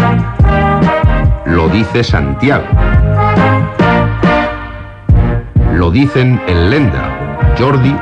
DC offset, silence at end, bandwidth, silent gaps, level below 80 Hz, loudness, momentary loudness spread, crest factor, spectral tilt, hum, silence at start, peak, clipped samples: under 0.1%; 0 s; 8 kHz; none; -18 dBFS; -11 LUFS; 4 LU; 10 dB; -8 dB/octave; none; 0 s; 0 dBFS; under 0.1%